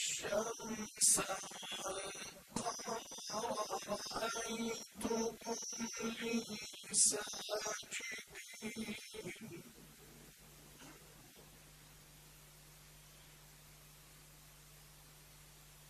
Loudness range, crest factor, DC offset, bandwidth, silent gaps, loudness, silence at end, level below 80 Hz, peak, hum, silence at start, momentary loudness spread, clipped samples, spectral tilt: 21 LU; 26 dB; under 0.1%; 14 kHz; none; -39 LUFS; 0 s; -70 dBFS; -18 dBFS; none; 0 s; 25 LU; under 0.1%; -1.5 dB/octave